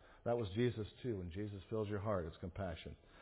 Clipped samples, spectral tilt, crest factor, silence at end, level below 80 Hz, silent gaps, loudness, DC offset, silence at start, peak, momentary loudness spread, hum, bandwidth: under 0.1%; -6.5 dB/octave; 16 dB; 0 s; -58 dBFS; none; -42 LUFS; under 0.1%; 0 s; -26 dBFS; 9 LU; none; 4 kHz